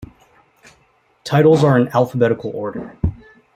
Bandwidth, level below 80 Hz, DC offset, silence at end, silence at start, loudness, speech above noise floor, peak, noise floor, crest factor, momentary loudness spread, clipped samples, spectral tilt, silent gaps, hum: 15 kHz; -42 dBFS; under 0.1%; 0.4 s; 0 s; -17 LUFS; 43 dB; -2 dBFS; -58 dBFS; 18 dB; 14 LU; under 0.1%; -7.5 dB/octave; none; none